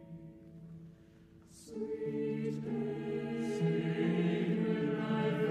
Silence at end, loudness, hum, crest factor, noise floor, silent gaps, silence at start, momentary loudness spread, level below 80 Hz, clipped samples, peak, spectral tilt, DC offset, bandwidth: 0 s; -35 LUFS; none; 16 dB; -59 dBFS; none; 0 s; 20 LU; -70 dBFS; under 0.1%; -20 dBFS; -8 dB/octave; under 0.1%; 10.5 kHz